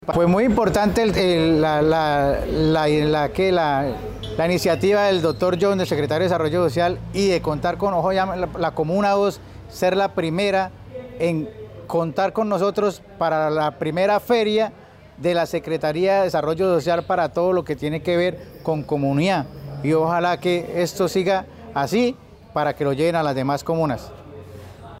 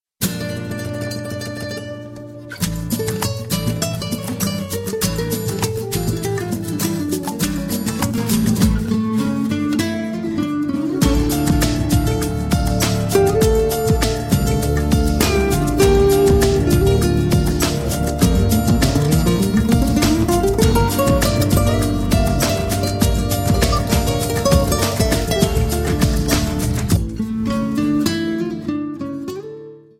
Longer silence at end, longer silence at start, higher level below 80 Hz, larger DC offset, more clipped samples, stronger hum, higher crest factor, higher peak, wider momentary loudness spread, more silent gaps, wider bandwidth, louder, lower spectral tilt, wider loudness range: second, 0 s vs 0.2 s; second, 0 s vs 0.2 s; second, -44 dBFS vs -26 dBFS; neither; neither; neither; about the same, 12 dB vs 16 dB; second, -8 dBFS vs -2 dBFS; about the same, 9 LU vs 9 LU; neither; about the same, 16 kHz vs 16.5 kHz; second, -21 LUFS vs -18 LUFS; about the same, -6 dB/octave vs -5.5 dB/octave; about the same, 4 LU vs 6 LU